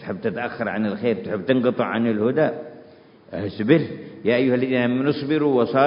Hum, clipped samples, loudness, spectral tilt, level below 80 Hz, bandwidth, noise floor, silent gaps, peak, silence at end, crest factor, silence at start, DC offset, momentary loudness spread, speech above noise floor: none; under 0.1%; -22 LUFS; -11.5 dB/octave; -58 dBFS; 5.4 kHz; -48 dBFS; none; -2 dBFS; 0 s; 20 dB; 0 s; under 0.1%; 11 LU; 27 dB